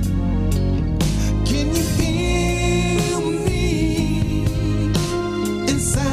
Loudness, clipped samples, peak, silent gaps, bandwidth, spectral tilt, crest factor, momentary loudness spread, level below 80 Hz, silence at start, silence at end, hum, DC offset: -20 LUFS; under 0.1%; -6 dBFS; none; 15.5 kHz; -5.5 dB/octave; 12 dB; 2 LU; -26 dBFS; 0 s; 0 s; none; under 0.1%